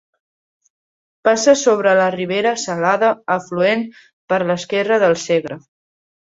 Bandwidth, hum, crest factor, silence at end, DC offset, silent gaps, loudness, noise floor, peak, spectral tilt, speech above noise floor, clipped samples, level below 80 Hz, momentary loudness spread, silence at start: 8 kHz; none; 16 dB; 0.8 s; under 0.1%; 4.13-4.28 s; -17 LUFS; under -90 dBFS; -2 dBFS; -4 dB/octave; over 74 dB; under 0.1%; -64 dBFS; 8 LU; 1.25 s